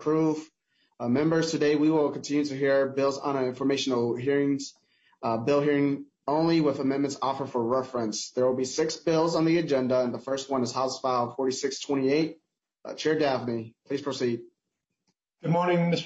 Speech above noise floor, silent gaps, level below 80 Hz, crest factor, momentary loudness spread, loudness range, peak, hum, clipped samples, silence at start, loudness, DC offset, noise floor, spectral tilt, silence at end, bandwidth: 58 dB; none; -72 dBFS; 14 dB; 9 LU; 3 LU; -12 dBFS; none; under 0.1%; 0 s; -27 LUFS; under 0.1%; -84 dBFS; -5.5 dB/octave; 0 s; 8.2 kHz